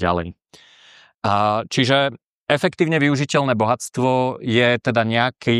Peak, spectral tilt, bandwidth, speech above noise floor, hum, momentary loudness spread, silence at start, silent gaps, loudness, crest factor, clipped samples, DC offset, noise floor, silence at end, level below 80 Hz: -2 dBFS; -5.5 dB/octave; 13.5 kHz; 32 dB; none; 6 LU; 0 s; 1.14-1.19 s, 2.26-2.46 s; -19 LUFS; 18 dB; under 0.1%; under 0.1%; -50 dBFS; 0 s; -52 dBFS